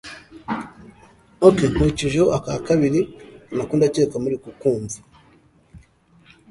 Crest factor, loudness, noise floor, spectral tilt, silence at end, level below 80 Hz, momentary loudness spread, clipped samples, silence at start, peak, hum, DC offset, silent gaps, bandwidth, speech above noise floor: 22 dB; -20 LUFS; -55 dBFS; -6.5 dB/octave; 0.75 s; -42 dBFS; 16 LU; under 0.1%; 0.05 s; 0 dBFS; none; under 0.1%; none; 11.5 kHz; 35 dB